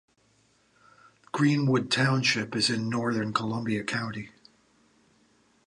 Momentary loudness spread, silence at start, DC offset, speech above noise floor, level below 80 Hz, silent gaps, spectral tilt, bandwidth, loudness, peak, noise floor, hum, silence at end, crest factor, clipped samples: 12 LU; 1.35 s; under 0.1%; 39 dB; -68 dBFS; none; -5 dB/octave; 11 kHz; -27 LUFS; -8 dBFS; -66 dBFS; none; 1.4 s; 20 dB; under 0.1%